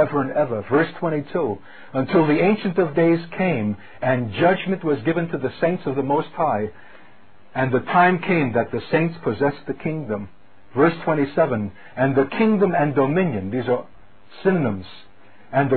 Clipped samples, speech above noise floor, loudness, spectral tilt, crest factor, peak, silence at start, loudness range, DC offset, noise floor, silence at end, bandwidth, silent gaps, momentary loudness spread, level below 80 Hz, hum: under 0.1%; 32 dB; -21 LUFS; -12 dB/octave; 18 dB; -4 dBFS; 0 s; 2 LU; 0.9%; -52 dBFS; 0 s; 4.5 kHz; none; 9 LU; -54 dBFS; none